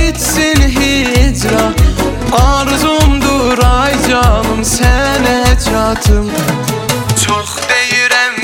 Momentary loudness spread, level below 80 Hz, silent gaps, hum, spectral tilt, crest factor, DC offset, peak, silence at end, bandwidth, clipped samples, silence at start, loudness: 3 LU; -16 dBFS; none; none; -4 dB/octave; 10 dB; under 0.1%; 0 dBFS; 0 s; 17.5 kHz; under 0.1%; 0 s; -11 LUFS